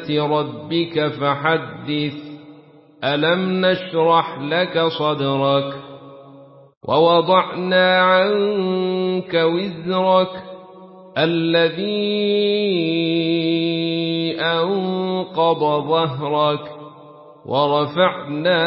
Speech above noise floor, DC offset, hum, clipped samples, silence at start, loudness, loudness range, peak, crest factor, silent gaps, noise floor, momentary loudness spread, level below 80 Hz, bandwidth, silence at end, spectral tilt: 28 dB; under 0.1%; none; under 0.1%; 0 s; -19 LUFS; 3 LU; -2 dBFS; 16 dB; 6.77-6.81 s; -46 dBFS; 9 LU; -62 dBFS; 5.8 kHz; 0 s; -10.5 dB/octave